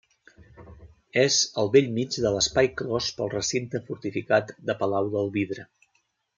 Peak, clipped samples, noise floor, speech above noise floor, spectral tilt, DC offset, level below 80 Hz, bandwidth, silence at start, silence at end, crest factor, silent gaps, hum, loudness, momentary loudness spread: -6 dBFS; under 0.1%; -72 dBFS; 47 dB; -3.5 dB/octave; under 0.1%; -56 dBFS; 9.6 kHz; 0.6 s; 0.75 s; 20 dB; none; none; -25 LUFS; 11 LU